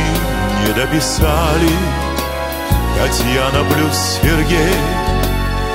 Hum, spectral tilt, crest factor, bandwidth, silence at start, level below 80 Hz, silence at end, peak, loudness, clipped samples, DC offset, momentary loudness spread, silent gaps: none; -4.5 dB/octave; 14 dB; 16.5 kHz; 0 s; -20 dBFS; 0 s; 0 dBFS; -15 LUFS; under 0.1%; under 0.1%; 5 LU; none